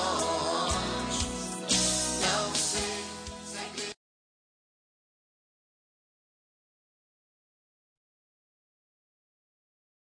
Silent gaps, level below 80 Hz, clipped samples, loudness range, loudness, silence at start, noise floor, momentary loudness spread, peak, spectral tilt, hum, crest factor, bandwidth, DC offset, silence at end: none; -52 dBFS; under 0.1%; 15 LU; -29 LUFS; 0 s; under -90 dBFS; 13 LU; -12 dBFS; -2 dB/octave; none; 22 dB; 10.5 kHz; under 0.1%; 6.15 s